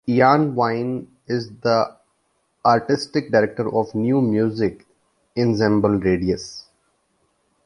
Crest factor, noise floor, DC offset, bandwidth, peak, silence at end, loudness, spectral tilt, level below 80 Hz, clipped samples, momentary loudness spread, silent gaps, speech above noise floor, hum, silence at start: 18 dB; -68 dBFS; under 0.1%; 11 kHz; -2 dBFS; 1.05 s; -20 LUFS; -7 dB/octave; -50 dBFS; under 0.1%; 10 LU; none; 49 dB; none; 0.05 s